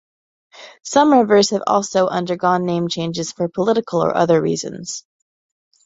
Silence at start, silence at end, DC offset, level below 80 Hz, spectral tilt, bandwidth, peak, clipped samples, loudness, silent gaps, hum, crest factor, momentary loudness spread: 0.55 s; 0.85 s; under 0.1%; -60 dBFS; -5 dB/octave; 8 kHz; -2 dBFS; under 0.1%; -17 LUFS; none; none; 18 dB; 13 LU